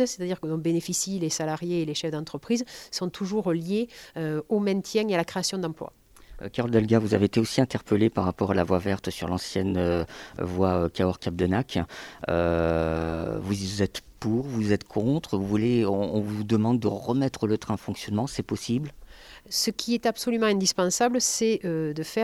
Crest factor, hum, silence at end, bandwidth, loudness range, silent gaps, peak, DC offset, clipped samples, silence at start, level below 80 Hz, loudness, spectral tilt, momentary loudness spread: 20 dB; none; 0 s; 16 kHz; 3 LU; none; -6 dBFS; under 0.1%; under 0.1%; 0 s; -50 dBFS; -26 LUFS; -5 dB/octave; 8 LU